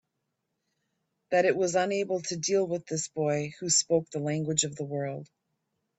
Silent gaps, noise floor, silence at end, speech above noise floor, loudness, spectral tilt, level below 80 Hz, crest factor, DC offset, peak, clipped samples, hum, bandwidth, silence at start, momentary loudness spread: none; -82 dBFS; 0.75 s; 53 dB; -28 LUFS; -3.5 dB/octave; -72 dBFS; 20 dB; under 0.1%; -10 dBFS; under 0.1%; none; 8.4 kHz; 1.3 s; 9 LU